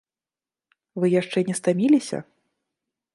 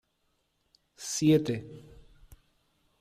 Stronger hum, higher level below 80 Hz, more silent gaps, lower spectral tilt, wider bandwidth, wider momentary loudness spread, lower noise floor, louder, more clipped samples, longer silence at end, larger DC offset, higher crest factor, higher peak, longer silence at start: neither; second, -74 dBFS vs -62 dBFS; neither; about the same, -6 dB/octave vs -5.5 dB/octave; second, 11.5 kHz vs 15 kHz; second, 14 LU vs 24 LU; first, under -90 dBFS vs -75 dBFS; first, -22 LUFS vs -28 LUFS; neither; second, 0.95 s vs 1.2 s; neither; about the same, 16 dB vs 20 dB; first, -8 dBFS vs -14 dBFS; about the same, 0.95 s vs 1 s